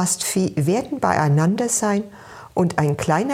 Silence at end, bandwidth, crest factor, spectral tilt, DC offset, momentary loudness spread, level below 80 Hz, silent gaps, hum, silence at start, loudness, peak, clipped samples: 0 s; 16.5 kHz; 18 dB; -5 dB/octave; under 0.1%; 8 LU; -52 dBFS; none; none; 0 s; -20 LUFS; -2 dBFS; under 0.1%